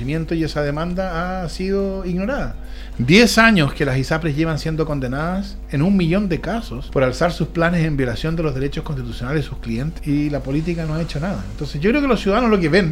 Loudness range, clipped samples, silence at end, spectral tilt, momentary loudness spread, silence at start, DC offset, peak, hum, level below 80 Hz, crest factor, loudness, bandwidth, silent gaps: 6 LU; under 0.1%; 0 s; -6 dB/octave; 11 LU; 0 s; under 0.1%; 0 dBFS; none; -30 dBFS; 18 dB; -19 LUFS; 16 kHz; none